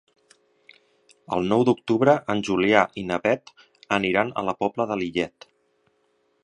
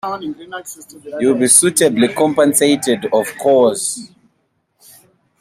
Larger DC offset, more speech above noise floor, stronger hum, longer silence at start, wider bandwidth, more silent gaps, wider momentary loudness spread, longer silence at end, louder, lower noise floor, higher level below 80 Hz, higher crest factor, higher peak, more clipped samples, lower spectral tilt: neither; second, 45 dB vs 50 dB; neither; first, 1.3 s vs 0.05 s; second, 10 kHz vs 16 kHz; neither; second, 8 LU vs 20 LU; second, 1.15 s vs 1.35 s; second, -23 LUFS vs -13 LUFS; about the same, -68 dBFS vs -65 dBFS; about the same, -58 dBFS vs -62 dBFS; first, 24 dB vs 16 dB; about the same, 0 dBFS vs 0 dBFS; neither; first, -6 dB/octave vs -3 dB/octave